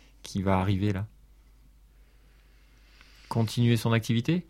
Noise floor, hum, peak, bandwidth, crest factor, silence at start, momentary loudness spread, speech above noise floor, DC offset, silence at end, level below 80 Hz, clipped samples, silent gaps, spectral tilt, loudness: -57 dBFS; none; -10 dBFS; 14.5 kHz; 20 dB; 0.25 s; 10 LU; 31 dB; under 0.1%; 0.05 s; -54 dBFS; under 0.1%; none; -6.5 dB/octave; -27 LUFS